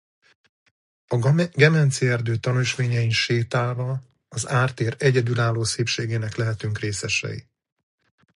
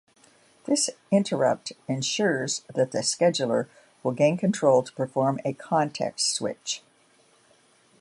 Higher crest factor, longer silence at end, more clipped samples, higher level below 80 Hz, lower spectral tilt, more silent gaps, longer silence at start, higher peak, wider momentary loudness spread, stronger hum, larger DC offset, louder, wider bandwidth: about the same, 22 dB vs 20 dB; second, 0.95 s vs 1.25 s; neither; first, -54 dBFS vs -74 dBFS; about the same, -5 dB/octave vs -4 dB/octave; neither; first, 1.1 s vs 0.65 s; first, -2 dBFS vs -6 dBFS; about the same, 10 LU vs 10 LU; neither; neither; first, -22 LUFS vs -25 LUFS; about the same, 11.5 kHz vs 11.5 kHz